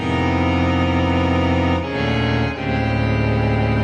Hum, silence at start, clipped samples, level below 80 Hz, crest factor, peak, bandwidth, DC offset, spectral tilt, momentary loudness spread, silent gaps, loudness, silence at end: none; 0 s; under 0.1%; -30 dBFS; 12 dB; -6 dBFS; 8.8 kHz; under 0.1%; -7.5 dB/octave; 3 LU; none; -19 LUFS; 0 s